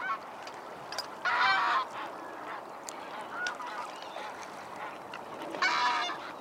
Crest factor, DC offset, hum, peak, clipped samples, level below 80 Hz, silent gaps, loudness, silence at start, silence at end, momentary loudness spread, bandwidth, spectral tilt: 20 dB; under 0.1%; none; -14 dBFS; under 0.1%; -80 dBFS; none; -33 LUFS; 0 s; 0 s; 16 LU; 16.5 kHz; -1.5 dB/octave